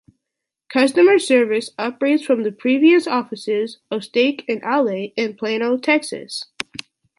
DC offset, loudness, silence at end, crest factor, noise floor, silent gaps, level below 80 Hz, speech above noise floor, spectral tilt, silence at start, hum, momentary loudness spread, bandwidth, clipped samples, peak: under 0.1%; -18 LUFS; 0.75 s; 16 dB; -82 dBFS; none; -70 dBFS; 64 dB; -4 dB/octave; 0.7 s; none; 14 LU; 11.5 kHz; under 0.1%; -2 dBFS